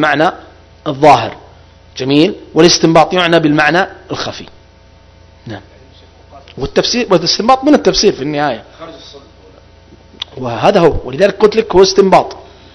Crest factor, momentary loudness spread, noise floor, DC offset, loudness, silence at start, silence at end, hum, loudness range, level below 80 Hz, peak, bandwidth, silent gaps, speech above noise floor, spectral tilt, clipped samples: 12 dB; 19 LU; -42 dBFS; under 0.1%; -11 LUFS; 0 s; 0.35 s; none; 7 LU; -36 dBFS; 0 dBFS; 11 kHz; none; 31 dB; -4.5 dB/octave; 1%